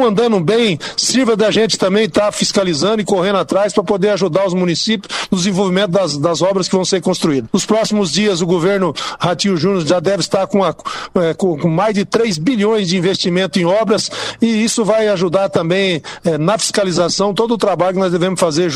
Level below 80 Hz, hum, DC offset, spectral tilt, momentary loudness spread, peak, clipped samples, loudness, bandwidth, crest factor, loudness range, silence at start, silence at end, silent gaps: -50 dBFS; none; under 0.1%; -4.5 dB/octave; 3 LU; -2 dBFS; under 0.1%; -15 LUFS; 15 kHz; 12 dB; 1 LU; 0 s; 0 s; none